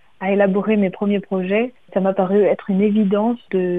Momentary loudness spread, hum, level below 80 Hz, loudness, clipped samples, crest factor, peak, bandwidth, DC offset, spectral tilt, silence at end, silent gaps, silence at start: 5 LU; none; -64 dBFS; -18 LUFS; under 0.1%; 14 dB; -2 dBFS; 3.8 kHz; 0.3%; -10 dB/octave; 0 s; none; 0.2 s